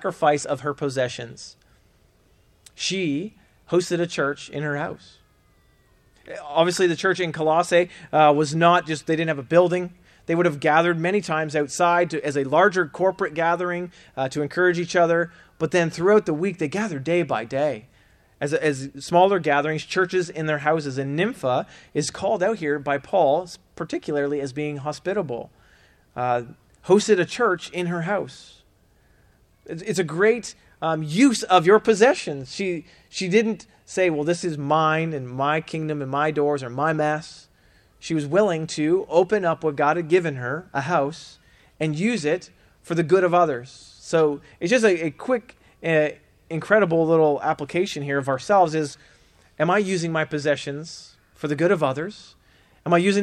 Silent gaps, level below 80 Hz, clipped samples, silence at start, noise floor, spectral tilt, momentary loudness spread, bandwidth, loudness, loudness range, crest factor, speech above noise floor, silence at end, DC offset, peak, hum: none; -62 dBFS; under 0.1%; 0 s; -59 dBFS; -5.5 dB/octave; 13 LU; 13 kHz; -22 LUFS; 6 LU; 20 dB; 37 dB; 0 s; under 0.1%; -4 dBFS; none